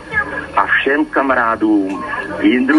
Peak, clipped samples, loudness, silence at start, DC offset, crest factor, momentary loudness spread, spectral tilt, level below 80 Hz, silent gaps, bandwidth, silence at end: 0 dBFS; under 0.1%; -15 LUFS; 0 s; under 0.1%; 14 dB; 7 LU; -6 dB/octave; -44 dBFS; none; 10.5 kHz; 0 s